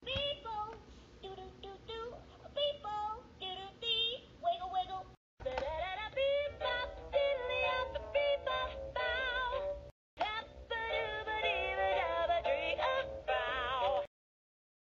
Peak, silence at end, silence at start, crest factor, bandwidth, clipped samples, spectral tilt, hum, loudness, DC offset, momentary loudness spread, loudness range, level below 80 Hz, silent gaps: -20 dBFS; 0.85 s; 0 s; 16 dB; 7.4 kHz; under 0.1%; 0 dB/octave; none; -36 LUFS; under 0.1%; 13 LU; 4 LU; -56 dBFS; 5.17-5.37 s, 9.91-10.17 s